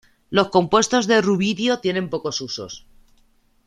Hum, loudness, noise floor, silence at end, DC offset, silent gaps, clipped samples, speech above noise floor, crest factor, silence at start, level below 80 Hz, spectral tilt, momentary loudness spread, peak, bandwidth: none; -20 LUFS; -59 dBFS; 0.9 s; under 0.1%; none; under 0.1%; 39 dB; 20 dB; 0.3 s; -56 dBFS; -4 dB/octave; 13 LU; -2 dBFS; 11.5 kHz